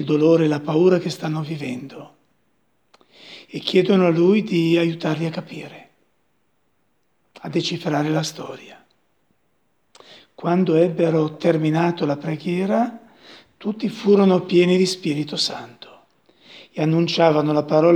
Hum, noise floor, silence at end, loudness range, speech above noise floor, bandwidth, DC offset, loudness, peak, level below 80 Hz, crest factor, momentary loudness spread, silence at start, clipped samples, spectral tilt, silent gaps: none; -69 dBFS; 0 s; 7 LU; 50 dB; 13 kHz; under 0.1%; -20 LUFS; 0 dBFS; -72 dBFS; 20 dB; 19 LU; 0 s; under 0.1%; -6.5 dB/octave; none